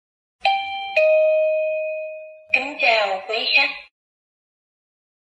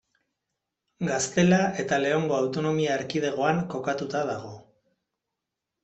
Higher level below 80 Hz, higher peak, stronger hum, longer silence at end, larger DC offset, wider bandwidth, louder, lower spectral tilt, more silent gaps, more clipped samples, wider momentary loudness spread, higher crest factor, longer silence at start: second, -72 dBFS vs -66 dBFS; first, -2 dBFS vs -8 dBFS; neither; first, 1.55 s vs 1.25 s; neither; about the same, 8.2 kHz vs 8.2 kHz; first, -19 LUFS vs -26 LUFS; second, -1.5 dB/octave vs -5 dB/octave; neither; neither; first, 13 LU vs 9 LU; about the same, 20 dB vs 20 dB; second, 0.45 s vs 1 s